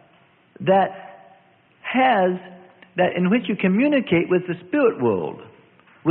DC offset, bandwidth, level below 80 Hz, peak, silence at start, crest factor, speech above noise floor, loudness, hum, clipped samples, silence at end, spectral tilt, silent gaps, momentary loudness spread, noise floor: under 0.1%; 4.3 kHz; -64 dBFS; -6 dBFS; 0.6 s; 16 dB; 37 dB; -21 LUFS; none; under 0.1%; 0 s; -11.5 dB/octave; none; 14 LU; -56 dBFS